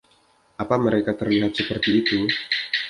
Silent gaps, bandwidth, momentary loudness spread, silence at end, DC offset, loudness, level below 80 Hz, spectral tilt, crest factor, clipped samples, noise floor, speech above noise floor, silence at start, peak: none; 11 kHz; 4 LU; 0 s; under 0.1%; -22 LUFS; -52 dBFS; -6 dB/octave; 18 dB; under 0.1%; -60 dBFS; 38 dB; 0.6 s; -4 dBFS